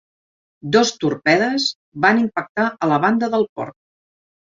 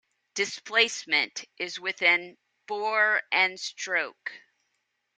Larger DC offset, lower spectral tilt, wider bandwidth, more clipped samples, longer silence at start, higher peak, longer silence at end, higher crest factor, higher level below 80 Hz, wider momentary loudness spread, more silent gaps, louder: neither; first, -4.5 dB/octave vs 0 dB/octave; second, 7.6 kHz vs 9.6 kHz; neither; first, 0.65 s vs 0.35 s; first, -2 dBFS vs -6 dBFS; about the same, 0.9 s vs 0.8 s; about the same, 18 dB vs 22 dB; first, -62 dBFS vs -84 dBFS; second, 8 LU vs 14 LU; first, 1.75-1.92 s, 2.49-2.55 s, 3.49-3.56 s vs none; first, -18 LUFS vs -26 LUFS